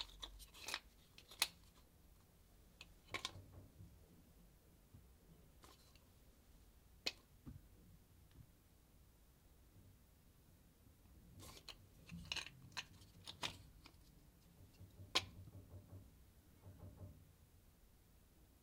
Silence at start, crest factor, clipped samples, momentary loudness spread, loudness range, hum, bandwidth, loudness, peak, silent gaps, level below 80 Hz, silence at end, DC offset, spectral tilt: 0 s; 40 dB; under 0.1%; 23 LU; 17 LU; none; 16 kHz; -49 LUFS; -16 dBFS; none; -70 dBFS; 0 s; under 0.1%; -2 dB/octave